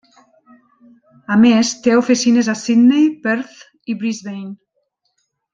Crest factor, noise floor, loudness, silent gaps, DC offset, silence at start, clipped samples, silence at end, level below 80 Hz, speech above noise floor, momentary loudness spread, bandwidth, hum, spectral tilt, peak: 16 dB; -69 dBFS; -15 LUFS; none; under 0.1%; 1.3 s; under 0.1%; 1 s; -62 dBFS; 54 dB; 18 LU; 7.8 kHz; none; -4.5 dB/octave; -2 dBFS